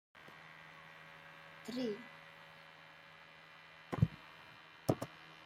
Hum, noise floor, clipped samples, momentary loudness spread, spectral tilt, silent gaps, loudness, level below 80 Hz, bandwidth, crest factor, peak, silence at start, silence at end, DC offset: none; -59 dBFS; under 0.1%; 19 LU; -7 dB/octave; none; -43 LUFS; -66 dBFS; 16 kHz; 28 dB; -16 dBFS; 0.15 s; 0 s; under 0.1%